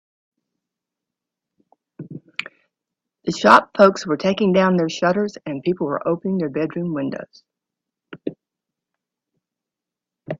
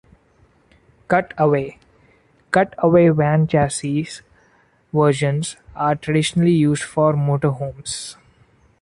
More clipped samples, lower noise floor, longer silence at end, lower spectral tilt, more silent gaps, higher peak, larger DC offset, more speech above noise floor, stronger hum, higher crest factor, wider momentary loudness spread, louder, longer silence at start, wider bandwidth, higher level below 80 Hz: neither; first, -87 dBFS vs -57 dBFS; second, 0.05 s vs 0.7 s; about the same, -6 dB/octave vs -6 dB/octave; neither; about the same, 0 dBFS vs -2 dBFS; neither; first, 68 dB vs 39 dB; neither; about the same, 22 dB vs 18 dB; first, 20 LU vs 12 LU; about the same, -19 LUFS vs -19 LUFS; first, 2 s vs 1.1 s; second, 10 kHz vs 11.5 kHz; second, -64 dBFS vs -50 dBFS